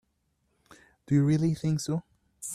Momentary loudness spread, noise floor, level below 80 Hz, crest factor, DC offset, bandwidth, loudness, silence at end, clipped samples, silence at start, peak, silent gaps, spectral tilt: 10 LU; -75 dBFS; -62 dBFS; 16 dB; under 0.1%; 13.5 kHz; -28 LUFS; 0 s; under 0.1%; 1.1 s; -14 dBFS; none; -6.5 dB/octave